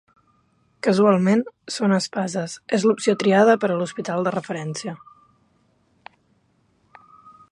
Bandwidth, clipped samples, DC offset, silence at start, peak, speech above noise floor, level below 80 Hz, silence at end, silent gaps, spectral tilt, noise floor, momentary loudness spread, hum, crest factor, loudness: 11 kHz; under 0.1%; under 0.1%; 0.85 s; -2 dBFS; 44 dB; -70 dBFS; 2.55 s; none; -5.5 dB/octave; -64 dBFS; 13 LU; none; 20 dB; -21 LUFS